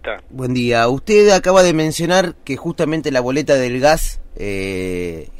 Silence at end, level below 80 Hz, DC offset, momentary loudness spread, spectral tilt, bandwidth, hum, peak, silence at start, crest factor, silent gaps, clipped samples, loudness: 0 s; -32 dBFS; under 0.1%; 14 LU; -4.5 dB/octave; 16 kHz; none; -2 dBFS; 0.05 s; 14 dB; none; under 0.1%; -16 LUFS